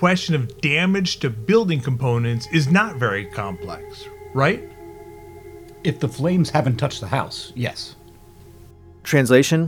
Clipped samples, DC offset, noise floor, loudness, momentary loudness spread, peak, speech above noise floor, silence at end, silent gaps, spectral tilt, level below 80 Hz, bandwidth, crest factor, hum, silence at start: under 0.1%; under 0.1%; -45 dBFS; -20 LUFS; 21 LU; 0 dBFS; 25 dB; 0 s; none; -5.5 dB/octave; -50 dBFS; 18 kHz; 20 dB; none; 0 s